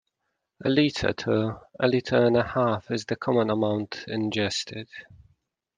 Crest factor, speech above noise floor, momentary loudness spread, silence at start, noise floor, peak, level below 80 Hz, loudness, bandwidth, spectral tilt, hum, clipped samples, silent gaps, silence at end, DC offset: 18 dB; 55 dB; 10 LU; 0.6 s; -80 dBFS; -8 dBFS; -56 dBFS; -25 LUFS; 9.8 kHz; -5.5 dB/octave; none; under 0.1%; none; 0.75 s; under 0.1%